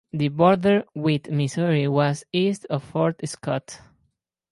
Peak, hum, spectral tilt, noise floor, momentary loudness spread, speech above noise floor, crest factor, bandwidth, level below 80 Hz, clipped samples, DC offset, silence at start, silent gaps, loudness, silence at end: -4 dBFS; none; -6.5 dB/octave; -71 dBFS; 10 LU; 49 dB; 18 dB; 11.5 kHz; -62 dBFS; under 0.1%; under 0.1%; 0.15 s; none; -23 LUFS; 0.75 s